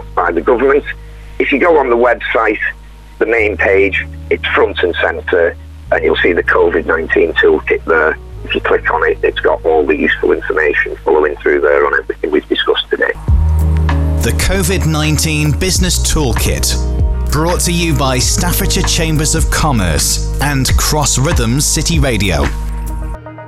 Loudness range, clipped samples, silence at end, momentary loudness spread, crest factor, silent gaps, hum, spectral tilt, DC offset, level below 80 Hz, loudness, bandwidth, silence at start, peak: 1 LU; under 0.1%; 0 s; 6 LU; 12 dB; none; none; -4 dB/octave; under 0.1%; -20 dBFS; -13 LUFS; 16 kHz; 0 s; 0 dBFS